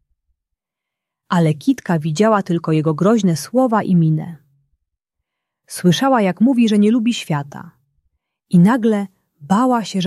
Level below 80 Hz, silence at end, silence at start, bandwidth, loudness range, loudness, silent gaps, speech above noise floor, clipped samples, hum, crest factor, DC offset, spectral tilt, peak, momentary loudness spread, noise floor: -62 dBFS; 0 s; 1.3 s; 13 kHz; 2 LU; -16 LUFS; none; 68 dB; under 0.1%; none; 14 dB; under 0.1%; -6.5 dB/octave; -2 dBFS; 9 LU; -83 dBFS